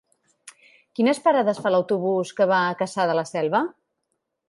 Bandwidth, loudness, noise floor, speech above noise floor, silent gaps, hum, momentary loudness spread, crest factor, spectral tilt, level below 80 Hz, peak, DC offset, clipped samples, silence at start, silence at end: 11.5 kHz; -22 LUFS; -77 dBFS; 56 dB; none; none; 5 LU; 18 dB; -5.5 dB/octave; -76 dBFS; -6 dBFS; under 0.1%; under 0.1%; 0.45 s; 0.8 s